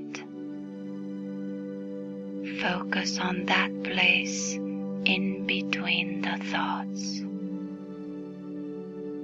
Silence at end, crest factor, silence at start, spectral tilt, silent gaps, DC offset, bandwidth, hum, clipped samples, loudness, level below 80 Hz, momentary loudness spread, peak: 0 s; 22 dB; 0 s; -3.5 dB/octave; none; under 0.1%; 8 kHz; none; under 0.1%; -29 LUFS; -68 dBFS; 14 LU; -8 dBFS